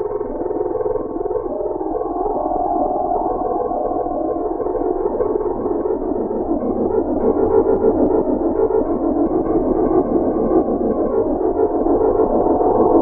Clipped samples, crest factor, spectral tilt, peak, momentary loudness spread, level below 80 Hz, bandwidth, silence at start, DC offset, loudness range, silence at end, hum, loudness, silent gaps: under 0.1%; 16 dB; -14 dB/octave; -2 dBFS; 7 LU; -34 dBFS; 2.3 kHz; 0 s; under 0.1%; 4 LU; 0 s; none; -18 LUFS; none